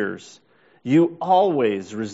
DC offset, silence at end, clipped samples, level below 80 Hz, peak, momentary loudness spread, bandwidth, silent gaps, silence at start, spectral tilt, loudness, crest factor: under 0.1%; 0 s; under 0.1%; -68 dBFS; -6 dBFS; 15 LU; 8 kHz; none; 0 s; -5.5 dB/octave; -20 LUFS; 16 dB